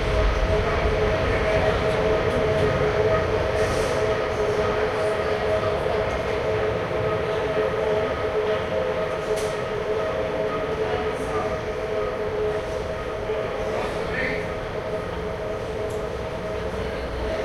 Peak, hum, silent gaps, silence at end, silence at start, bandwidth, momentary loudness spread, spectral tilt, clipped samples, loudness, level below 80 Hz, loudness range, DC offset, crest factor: -8 dBFS; none; none; 0 s; 0 s; 13.5 kHz; 7 LU; -6 dB/octave; under 0.1%; -24 LUFS; -34 dBFS; 6 LU; under 0.1%; 16 dB